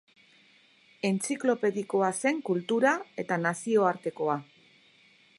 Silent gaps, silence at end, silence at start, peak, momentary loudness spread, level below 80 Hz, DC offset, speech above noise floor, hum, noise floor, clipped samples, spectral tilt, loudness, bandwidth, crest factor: none; 0.95 s; 1.05 s; -10 dBFS; 6 LU; -82 dBFS; under 0.1%; 33 dB; none; -61 dBFS; under 0.1%; -5 dB/octave; -28 LUFS; 11.5 kHz; 20 dB